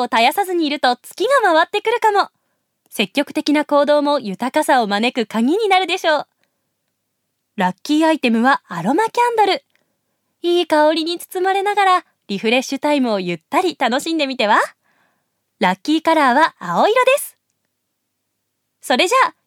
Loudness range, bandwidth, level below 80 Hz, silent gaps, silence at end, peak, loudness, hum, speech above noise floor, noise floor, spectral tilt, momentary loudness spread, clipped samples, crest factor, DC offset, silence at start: 2 LU; 17.5 kHz; -76 dBFS; none; 0.15 s; -2 dBFS; -17 LUFS; none; 57 dB; -73 dBFS; -4 dB/octave; 7 LU; under 0.1%; 16 dB; under 0.1%; 0 s